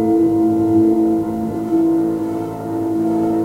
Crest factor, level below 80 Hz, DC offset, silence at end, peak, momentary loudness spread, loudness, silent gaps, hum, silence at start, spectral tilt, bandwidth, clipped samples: 12 dB; -48 dBFS; under 0.1%; 0 s; -4 dBFS; 8 LU; -17 LUFS; none; 50 Hz at -40 dBFS; 0 s; -9 dB/octave; 7.8 kHz; under 0.1%